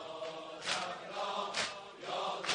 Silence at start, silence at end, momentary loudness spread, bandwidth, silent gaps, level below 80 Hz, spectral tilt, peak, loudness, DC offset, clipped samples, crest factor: 0 s; 0 s; 7 LU; 10 kHz; none; -78 dBFS; -1 dB/octave; -14 dBFS; -38 LUFS; under 0.1%; under 0.1%; 24 dB